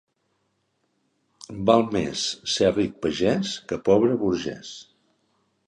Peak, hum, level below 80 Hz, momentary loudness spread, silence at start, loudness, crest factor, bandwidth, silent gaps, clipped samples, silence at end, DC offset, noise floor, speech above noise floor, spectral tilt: -4 dBFS; none; -54 dBFS; 16 LU; 1.5 s; -23 LUFS; 22 dB; 11 kHz; none; under 0.1%; 0.85 s; under 0.1%; -72 dBFS; 49 dB; -5 dB/octave